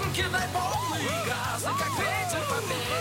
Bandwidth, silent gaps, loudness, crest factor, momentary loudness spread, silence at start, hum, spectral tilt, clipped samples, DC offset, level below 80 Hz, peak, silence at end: 17 kHz; none; -28 LUFS; 14 dB; 2 LU; 0 s; none; -3.5 dB/octave; under 0.1%; under 0.1%; -50 dBFS; -14 dBFS; 0 s